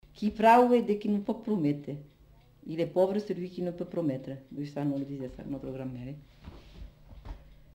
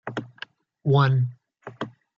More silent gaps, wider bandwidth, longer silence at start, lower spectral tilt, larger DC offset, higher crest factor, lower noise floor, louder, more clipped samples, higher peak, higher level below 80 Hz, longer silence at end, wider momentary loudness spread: neither; first, 16 kHz vs 6.8 kHz; about the same, 0.15 s vs 0.05 s; about the same, -7.5 dB/octave vs -8.5 dB/octave; neither; about the same, 20 dB vs 18 dB; first, -58 dBFS vs -45 dBFS; second, -29 LUFS vs -23 LUFS; neither; second, -10 dBFS vs -6 dBFS; first, -56 dBFS vs -70 dBFS; about the same, 0.2 s vs 0.3 s; about the same, 24 LU vs 23 LU